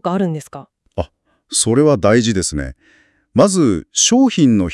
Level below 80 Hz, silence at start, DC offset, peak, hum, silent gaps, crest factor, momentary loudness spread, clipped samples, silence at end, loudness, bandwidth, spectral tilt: -40 dBFS; 0.05 s; under 0.1%; 0 dBFS; none; none; 16 dB; 16 LU; under 0.1%; 0 s; -14 LUFS; 12 kHz; -4.5 dB/octave